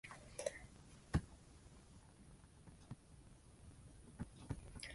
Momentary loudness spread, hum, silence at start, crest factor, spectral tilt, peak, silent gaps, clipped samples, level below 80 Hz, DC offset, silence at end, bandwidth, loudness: 20 LU; none; 0.05 s; 28 dB; -5.5 dB/octave; -24 dBFS; none; under 0.1%; -58 dBFS; under 0.1%; 0 s; 11.5 kHz; -50 LUFS